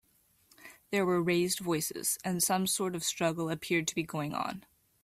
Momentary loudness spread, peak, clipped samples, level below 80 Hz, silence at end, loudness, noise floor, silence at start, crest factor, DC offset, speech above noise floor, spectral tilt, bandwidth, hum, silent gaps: 7 LU; -16 dBFS; under 0.1%; -68 dBFS; 0.45 s; -31 LUFS; -67 dBFS; 0.6 s; 16 dB; under 0.1%; 36 dB; -3.5 dB/octave; 16 kHz; none; none